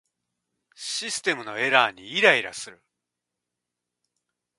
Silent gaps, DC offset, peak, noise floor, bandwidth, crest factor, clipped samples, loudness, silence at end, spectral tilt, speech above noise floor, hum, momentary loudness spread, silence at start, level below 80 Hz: none; under 0.1%; -2 dBFS; -85 dBFS; 11.5 kHz; 26 dB; under 0.1%; -22 LUFS; 1.85 s; -1.5 dB/octave; 61 dB; 60 Hz at -65 dBFS; 18 LU; 0.8 s; -76 dBFS